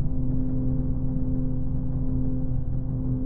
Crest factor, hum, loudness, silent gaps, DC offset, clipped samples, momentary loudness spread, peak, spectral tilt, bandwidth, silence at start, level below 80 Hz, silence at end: 12 dB; none; -29 LUFS; none; under 0.1%; under 0.1%; 2 LU; -12 dBFS; -14.5 dB/octave; 1.6 kHz; 0 s; -28 dBFS; 0 s